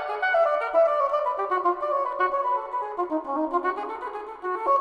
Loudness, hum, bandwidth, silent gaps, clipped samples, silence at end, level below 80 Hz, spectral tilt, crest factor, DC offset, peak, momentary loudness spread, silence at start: -25 LUFS; none; 8.2 kHz; none; under 0.1%; 0 s; -64 dBFS; -4.5 dB/octave; 14 dB; under 0.1%; -10 dBFS; 10 LU; 0 s